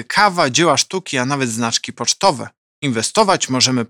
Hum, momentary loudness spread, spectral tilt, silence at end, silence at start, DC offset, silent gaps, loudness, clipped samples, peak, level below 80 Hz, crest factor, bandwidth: none; 8 LU; -3 dB/octave; 0.05 s; 0 s; under 0.1%; 2.57-2.82 s; -16 LUFS; under 0.1%; 0 dBFS; -58 dBFS; 16 dB; 17.5 kHz